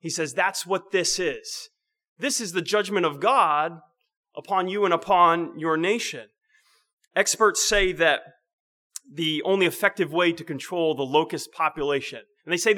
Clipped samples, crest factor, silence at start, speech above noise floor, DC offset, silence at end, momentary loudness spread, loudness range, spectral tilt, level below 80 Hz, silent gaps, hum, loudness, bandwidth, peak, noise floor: under 0.1%; 20 dB; 0.05 s; 40 dB; under 0.1%; 0 s; 13 LU; 2 LU; -2.5 dB/octave; -50 dBFS; 2.08-2.16 s, 4.17-4.23 s, 6.93-6.98 s, 8.53-8.90 s; none; -23 LUFS; 19.5 kHz; -4 dBFS; -64 dBFS